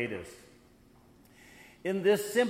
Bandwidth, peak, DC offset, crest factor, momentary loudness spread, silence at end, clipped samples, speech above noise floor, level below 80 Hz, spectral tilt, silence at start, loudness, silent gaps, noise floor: 16 kHz; -14 dBFS; under 0.1%; 20 dB; 26 LU; 0 s; under 0.1%; 30 dB; -68 dBFS; -4.5 dB/octave; 0 s; -31 LUFS; none; -60 dBFS